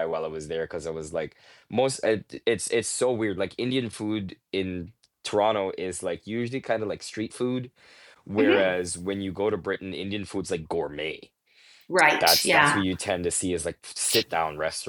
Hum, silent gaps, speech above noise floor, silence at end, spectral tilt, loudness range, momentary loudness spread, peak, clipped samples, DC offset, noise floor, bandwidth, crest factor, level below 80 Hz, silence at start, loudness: none; none; 30 dB; 0 s; -3.5 dB/octave; 7 LU; 13 LU; -4 dBFS; under 0.1%; under 0.1%; -57 dBFS; 19 kHz; 24 dB; -58 dBFS; 0 s; -26 LUFS